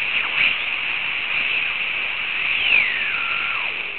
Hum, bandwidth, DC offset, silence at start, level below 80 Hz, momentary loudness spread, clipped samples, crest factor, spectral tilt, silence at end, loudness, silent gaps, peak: none; 4.5 kHz; 0.9%; 0 s; -54 dBFS; 6 LU; under 0.1%; 18 dB; -5.5 dB/octave; 0 s; -19 LUFS; none; -4 dBFS